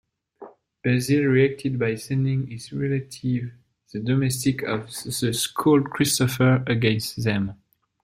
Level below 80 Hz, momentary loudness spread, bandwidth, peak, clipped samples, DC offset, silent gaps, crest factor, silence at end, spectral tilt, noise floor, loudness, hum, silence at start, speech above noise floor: -56 dBFS; 10 LU; 16 kHz; -6 dBFS; under 0.1%; under 0.1%; none; 16 dB; 0.5 s; -5.5 dB/octave; -46 dBFS; -23 LUFS; none; 0.4 s; 24 dB